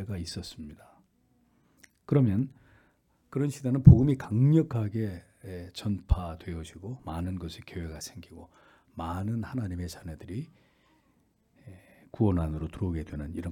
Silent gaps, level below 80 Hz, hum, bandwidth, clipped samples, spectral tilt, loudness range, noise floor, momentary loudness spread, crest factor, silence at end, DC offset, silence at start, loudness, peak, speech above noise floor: none; -44 dBFS; none; 12.5 kHz; under 0.1%; -8 dB/octave; 14 LU; -68 dBFS; 19 LU; 28 dB; 0 s; under 0.1%; 0 s; -28 LUFS; 0 dBFS; 41 dB